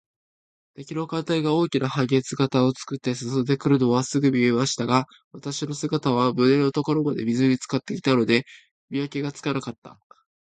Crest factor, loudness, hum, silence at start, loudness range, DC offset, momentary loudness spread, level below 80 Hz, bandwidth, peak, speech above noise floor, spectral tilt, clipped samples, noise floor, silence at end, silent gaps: 20 dB; -23 LUFS; none; 0.8 s; 3 LU; under 0.1%; 10 LU; -64 dBFS; 9.4 kHz; -4 dBFS; over 67 dB; -6 dB/octave; under 0.1%; under -90 dBFS; 0.5 s; 5.24-5.31 s, 8.71-8.88 s, 9.78-9.82 s